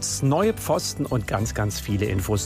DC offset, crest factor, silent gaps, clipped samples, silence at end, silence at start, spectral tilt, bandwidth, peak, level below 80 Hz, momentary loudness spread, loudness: under 0.1%; 14 dB; none; under 0.1%; 0 s; 0 s; -5 dB/octave; 15.5 kHz; -8 dBFS; -40 dBFS; 5 LU; -24 LUFS